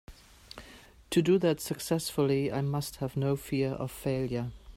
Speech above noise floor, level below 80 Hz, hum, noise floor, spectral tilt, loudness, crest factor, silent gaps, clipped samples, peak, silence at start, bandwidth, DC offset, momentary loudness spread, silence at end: 24 dB; -54 dBFS; none; -53 dBFS; -6 dB/octave; -30 LUFS; 18 dB; none; under 0.1%; -14 dBFS; 0.1 s; 16 kHz; under 0.1%; 11 LU; 0 s